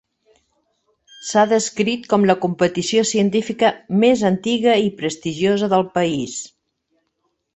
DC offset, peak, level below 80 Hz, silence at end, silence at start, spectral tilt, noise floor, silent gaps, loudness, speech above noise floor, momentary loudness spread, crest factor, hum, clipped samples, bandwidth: under 0.1%; -2 dBFS; -60 dBFS; 1.1 s; 1.2 s; -4.5 dB/octave; -71 dBFS; none; -18 LUFS; 54 dB; 8 LU; 16 dB; none; under 0.1%; 8.4 kHz